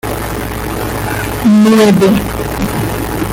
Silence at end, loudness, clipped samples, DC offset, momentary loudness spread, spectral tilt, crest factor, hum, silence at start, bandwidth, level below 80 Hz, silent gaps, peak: 0 s; -12 LUFS; under 0.1%; under 0.1%; 12 LU; -6 dB/octave; 10 dB; none; 0.05 s; 17 kHz; -28 dBFS; none; 0 dBFS